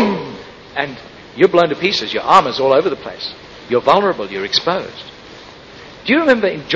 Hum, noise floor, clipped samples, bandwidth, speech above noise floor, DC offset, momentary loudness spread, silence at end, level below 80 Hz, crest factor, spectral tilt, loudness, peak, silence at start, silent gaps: none; -37 dBFS; under 0.1%; 8.6 kHz; 22 dB; under 0.1%; 23 LU; 0 s; -52 dBFS; 16 dB; -5 dB/octave; -15 LUFS; 0 dBFS; 0 s; none